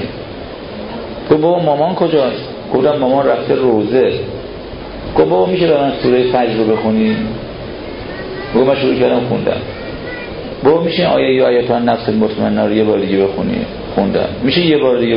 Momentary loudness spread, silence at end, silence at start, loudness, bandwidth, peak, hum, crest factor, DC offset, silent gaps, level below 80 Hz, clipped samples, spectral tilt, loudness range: 14 LU; 0 s; 0 s; -14 LUFS; 5.4 kHz; 0 dBFS; none; 14 dB; under 0.1%; none; -38 dBFS; under 0.1%; -11.5 dB/octave; 2 LU